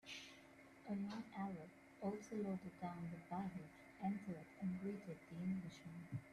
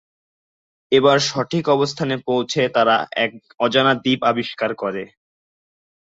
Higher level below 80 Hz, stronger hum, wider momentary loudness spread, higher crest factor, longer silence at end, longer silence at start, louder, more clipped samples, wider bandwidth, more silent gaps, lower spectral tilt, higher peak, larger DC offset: second, -78 dBFS vs -62 dBFS; neither; about the same, 10 LU vs 8 LU; about the same, 16 dB vs 18 dB; second, 0 s vs 1.1 s; second, 0.05 s vs 0.9 s; second, -49 LUFS vs -19 LUFS; neither; first, 12.5 kHz vs 8 kHz; neither; first, -7 dB/octave vs -4.5 dB/octave; second, -34 dBFS vs -2 dBFS; neither